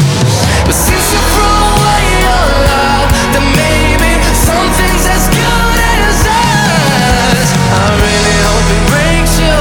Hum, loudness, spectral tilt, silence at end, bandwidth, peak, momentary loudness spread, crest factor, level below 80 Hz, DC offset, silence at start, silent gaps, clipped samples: none; -9 LUFS; -4 dB/octave; 0 s; 19.5 kHz; 0 dBFS; 1 LU; 8 dB; -14 dBFS; under 0.1%; 0 s; none; under 0.1%